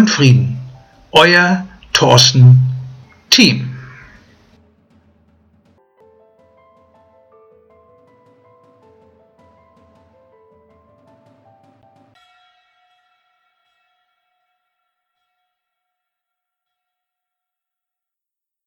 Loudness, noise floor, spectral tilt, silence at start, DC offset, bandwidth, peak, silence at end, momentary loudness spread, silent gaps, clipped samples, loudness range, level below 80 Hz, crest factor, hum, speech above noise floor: -10 LUFS; -86 dBFS; -4.5 dB/octave; 0 s; under 0.1%; 14 kHz; 0 dBFS; 14.8 s; 21 LU; none; under 0.1%; 7 LU; -54 dBFS; 18 dB; none; 77 dB